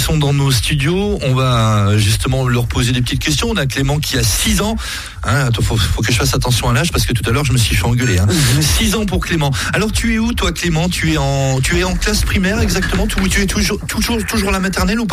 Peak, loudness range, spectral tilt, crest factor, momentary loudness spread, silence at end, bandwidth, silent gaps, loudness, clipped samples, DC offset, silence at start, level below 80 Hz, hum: -2 dBFS; 2 LU; -4.5 dB/octave; 14 dB; 3 LU; 0 s; 15.5 kHz; none; -15 LUFS; under 0.1%; under 0.1%; 0 s; -24 dBFS; none